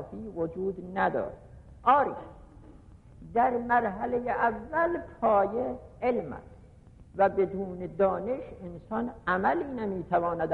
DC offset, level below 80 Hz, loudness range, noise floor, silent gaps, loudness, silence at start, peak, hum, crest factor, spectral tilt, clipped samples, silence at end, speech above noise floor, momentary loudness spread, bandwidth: under 0.1%; -54 dBFS; 3 LU; -53 dBFS; none; -29 LUFS; 0 s; -12 dBFS; none; 18 dB; -8.5 dB/octave; under 0.1%; 0 s; 24 dB; 14 LU; 4.7 kHz